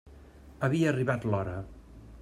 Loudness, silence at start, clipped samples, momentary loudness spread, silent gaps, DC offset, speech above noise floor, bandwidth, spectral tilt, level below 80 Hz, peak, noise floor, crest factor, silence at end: -30 LUFS; 0.05 s; under 0.1%; 13 LU; none; under 0.1%; 23 dB; 12.5 kHz; -7.5 dB/octave; -54 dBFS; -12 dBFS; -51 dBFS; 18 dB; 0 s